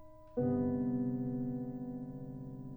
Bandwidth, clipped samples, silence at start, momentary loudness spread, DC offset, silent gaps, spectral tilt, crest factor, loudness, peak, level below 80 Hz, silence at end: 2.1 kHz; under 0.1%; 0 s; 12 LU; under 0.1%; none; -12.5 dB/octave; 14 dB; -38 LUFS; -24 dBFS; -60 dBFS; 0 s